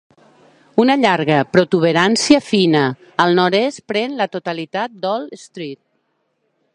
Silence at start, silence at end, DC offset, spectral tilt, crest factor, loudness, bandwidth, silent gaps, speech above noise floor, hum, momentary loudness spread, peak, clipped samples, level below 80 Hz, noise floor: 0.75 s; 1 s; under 0.1%; -5 dB/octave; 18 dB; -16 LUFS; 11 kHz; none; 51 dB; none; 11 LU; 0 dBFS; under 0.1%; -60 dBFS; -67 dBFS